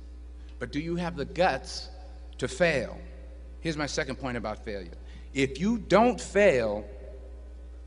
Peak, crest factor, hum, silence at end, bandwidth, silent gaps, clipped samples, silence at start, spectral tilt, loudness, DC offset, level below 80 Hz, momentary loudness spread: -8 dBFS; 22 dB; none; 0 s; 10.5 kHz; none; under 0.1%; 0 s; -5 dB/octave; -28 LUFS; under 0.1%; -44 dBFS; 23 LU